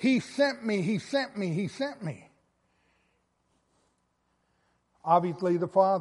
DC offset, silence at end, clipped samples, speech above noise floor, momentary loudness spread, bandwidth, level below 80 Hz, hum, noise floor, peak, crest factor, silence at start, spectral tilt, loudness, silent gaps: under 0.1%; 0 s; under 0.1%; 47 dB; 14 LU; 11.5 kHz; -76 dBFS; none; -74 dBFS; -10 dBFS; 20 dB; 0 s; -6.5 dB/octave; -28 LUFS; none